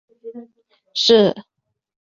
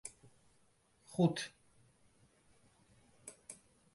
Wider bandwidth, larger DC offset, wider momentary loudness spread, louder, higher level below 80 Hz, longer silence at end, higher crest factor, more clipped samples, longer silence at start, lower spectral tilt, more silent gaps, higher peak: second, 7.6 kHz vs 11.5 kHz; neither; first, 24 LU vs 21 LU; first, -16 LUFS vs -37 LUFS; first, -62 dBFS vs -76 dBFS; first, 0.75 s vs 0.4 s; second, 18 dB vs 24 dB; neither; first, 0.25 s vs 0.05 s; second, -4 dB/octave vs -5.5 dB/octave; neither; first, -2 dBFS vs -18 dBFS